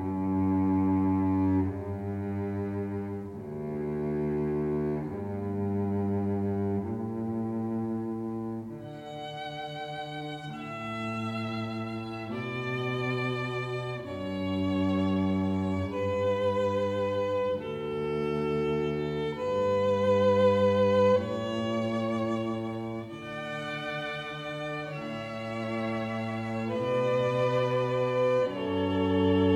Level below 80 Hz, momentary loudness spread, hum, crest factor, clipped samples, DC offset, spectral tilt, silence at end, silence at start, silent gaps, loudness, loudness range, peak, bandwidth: -60 dBFS; 11 LU; none; 16 dB; under 0.1%; under 0.1%; -7.5 dB/octave; 0 s; 0 s; none; -30 LUFS; 9 LU; -14 dBFS; 10.5 kHz